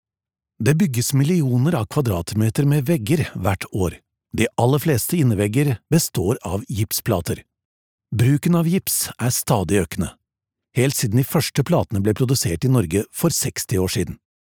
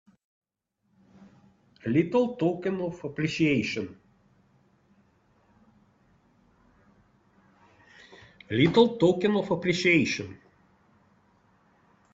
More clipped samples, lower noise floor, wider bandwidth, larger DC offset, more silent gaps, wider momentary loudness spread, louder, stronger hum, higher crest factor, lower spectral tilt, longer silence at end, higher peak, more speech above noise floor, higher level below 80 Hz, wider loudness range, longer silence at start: neither; first, -89 dBFS vs -77 dBFS; first, over 20 kHz vs 7.8 kHz; neither; first, 7.65-7.98 s vs none; second, 7 LU vs 13 LU; first, -20 LUFS vs -25 LUFS; neither; about the same, 18 dB vs 22 dB; about the same, -5.5 dB/octave vs -6 dB/octave; second, 0.4 s vs 1.75 s; first, -2 dBFS vs -6 dBFS; first, 70 dB vs 52 dB; first, -46 dBFS vs -64 dBFS; second, 2 LU vs 7 LU; second, 0.6 s vs 1.85 s